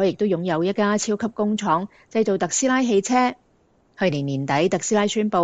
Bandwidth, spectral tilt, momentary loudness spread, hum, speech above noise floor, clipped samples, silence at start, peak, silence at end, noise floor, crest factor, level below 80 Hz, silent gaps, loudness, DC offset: 9.2 kHz; -4.5 dB/octave; 5 LU; none; 40 dB; under 0.1%; 0 s; -6 dBFS; 0 s; -60 dBFS; 14 dB; -62 dBFS; none; -21 LUFS; under 0.1%